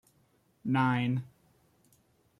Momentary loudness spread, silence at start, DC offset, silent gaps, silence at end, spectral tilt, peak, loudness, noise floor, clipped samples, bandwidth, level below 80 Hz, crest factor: 15 LU; 0.65 s; under 0.1%; none; 1.15 s; -8 dB/octave; -14 dBFS; -31 LUFS; -69 dBFS; under 0.1%; 11 kHz; -72 dBFS; 20 dB